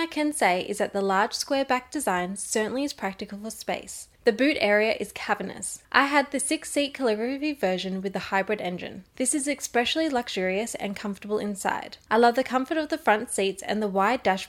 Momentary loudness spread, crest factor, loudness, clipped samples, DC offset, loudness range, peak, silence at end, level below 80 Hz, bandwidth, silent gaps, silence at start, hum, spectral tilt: 10 LU; 24 dB; -26 LUFS; under 0.1%; under 0.1%; 3 LU; -2 dBFS; 0 s; -62 dBFS; 16 kHz; none; 0 s; none; -3 dB/octave